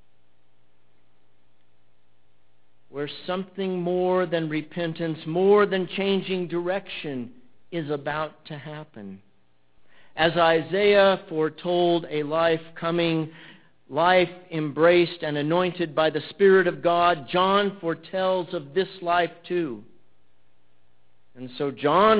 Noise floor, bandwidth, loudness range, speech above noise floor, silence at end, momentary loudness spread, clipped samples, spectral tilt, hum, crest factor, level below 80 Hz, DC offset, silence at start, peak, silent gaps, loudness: -68 dBFS; 4 kHz; 10 LU; 45 dB; 0 s; 15 LU; under 0.1%; -9.5 dB/octave; none; 20 dB; -62 dBFS; 0.2%; 2.95 s; -4 dBFS; none; -24 LUFS